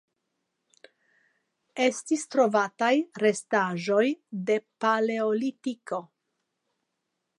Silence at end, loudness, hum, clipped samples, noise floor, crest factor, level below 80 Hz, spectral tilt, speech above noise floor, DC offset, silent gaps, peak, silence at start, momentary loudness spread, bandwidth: 1.35 s; -27 LUFS; none; under 0.1%; -81 dBFS; 18 dB; -84 dBFS; -4.5 dB/octave; 55 dB; under 0.1%; none; -10 dBFS; 1.75 s; 10 LU; 11.5 kHz